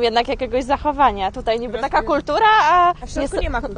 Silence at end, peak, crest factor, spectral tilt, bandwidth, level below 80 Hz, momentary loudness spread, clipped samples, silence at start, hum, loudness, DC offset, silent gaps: 0 s; -4 dBFS; 14 dB; -4.5 dB/octave; 10 kHz; -32 dBFS; 10 LU; under 0.1%; 0 s; none; -18 LUFS; under 0.1%; none